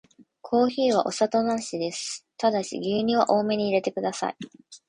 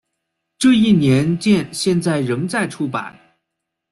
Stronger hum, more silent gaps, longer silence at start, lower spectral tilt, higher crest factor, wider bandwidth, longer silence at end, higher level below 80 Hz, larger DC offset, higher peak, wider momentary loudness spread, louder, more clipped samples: neither; neither; second, 0.2 s vs 0.6 s; second, -4.5 dB/octave vs -6 dB/octave; about the same, 18 dB vs 14 dB; second, 11 kHz vs 12.5 kHz; second, 0.1 s vs 0.8 s; second, -66 dBFS vs -52 dBFS; neither; about the same, -6 dBFS vs -4 dBFS; about the same, 10 LU vs 10 LU; second, -25 LUFS vs -17 LUFS; neither